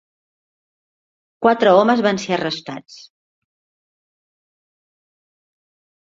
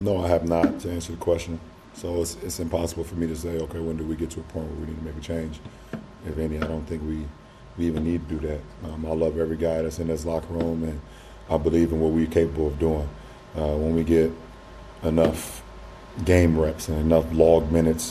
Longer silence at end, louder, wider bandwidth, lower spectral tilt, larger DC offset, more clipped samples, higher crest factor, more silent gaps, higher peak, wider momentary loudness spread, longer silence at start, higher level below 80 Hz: first, 3.1 s vs 0 s; first, -17 LUFS vs -25 LUFS; second, 7.8 kHz vs 13.5 kHz; second, -5 dB/octave vs -6.5 dB/octave; neither; neither; about the same, 20 dB vs 22 dB; neither; about the same, -2 dBFS vs -2 dBFS; about the same, 17 LU vs 17 LU; first, 1.4 s vs 0 s; second, -64 dBFS vs -38 dBFS